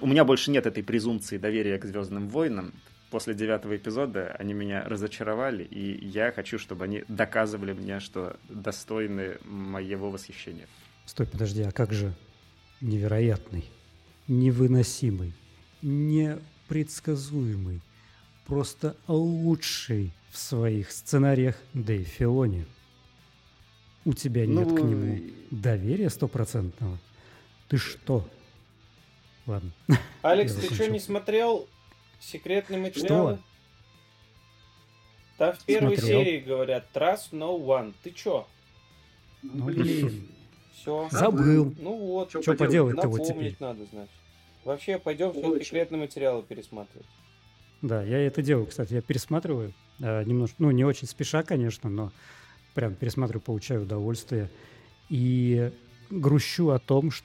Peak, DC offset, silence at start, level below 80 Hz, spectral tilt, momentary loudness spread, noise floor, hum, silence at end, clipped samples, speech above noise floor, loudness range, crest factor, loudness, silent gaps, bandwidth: -4 dBFS; under 0.1%; 0 s; -56 dBFS; -6.5 dB/octave; 14 LU; -58 dBFS; none; 0.05 s; under 0.1%; 31 dB; 6 LU; 24 dB; -28 LUFS; none; 16.5 kHz